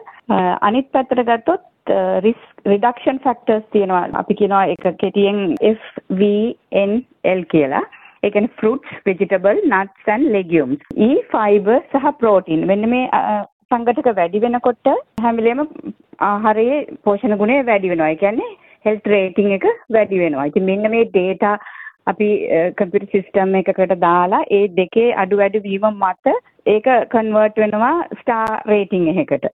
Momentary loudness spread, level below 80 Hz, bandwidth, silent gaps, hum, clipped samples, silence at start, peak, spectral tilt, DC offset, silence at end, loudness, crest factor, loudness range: 5 LU; -56 dBFS; 4 kHz; 13.52-13.69 s; none; under 0.1%; 0 s; -2 dBFS; -9 dB/octave; under 0.1%; 0.05 s; -17 LUFS; 14 dB; 2 LU